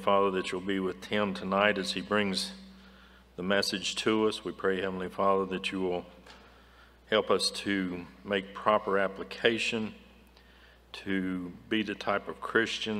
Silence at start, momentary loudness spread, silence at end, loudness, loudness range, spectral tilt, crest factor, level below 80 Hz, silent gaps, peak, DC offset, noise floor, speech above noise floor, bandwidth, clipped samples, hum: 0 s; 10 LU; 0 s; -30 LUFS; 3 LU; -4 dB/octave; 24 dB; -62 dBFS; none; -8 dBFS; under 0.1%; -57 dBFS; 27 dB; 15.5 kHz; under 0.1%; none